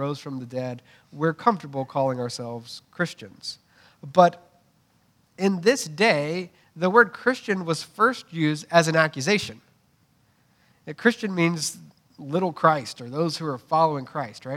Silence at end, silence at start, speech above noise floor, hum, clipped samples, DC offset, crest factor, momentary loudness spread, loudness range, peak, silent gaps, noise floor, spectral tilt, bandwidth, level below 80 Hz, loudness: 0 s; 0 s; 40 dB; none; under 0.1%; under 0.1%; 24 dB; 17 LU; 6 LU; -2 dBFS; none; -64 dBFS; -5 dB/octave; 16 kHz; -72 dBFS; -24 LUFS